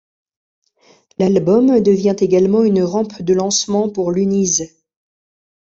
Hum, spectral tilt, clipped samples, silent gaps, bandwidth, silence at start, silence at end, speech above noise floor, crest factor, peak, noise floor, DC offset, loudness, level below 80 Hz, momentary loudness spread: none; -5.5 dB/octave; under 0.1%; none; 8 kHz; 1.2 s; 1 s; 39 dB; 14 dB; -2 dBFS; -53 dBFS; under 0.1%; -15 LUFS; -56 dBFS; 7 LU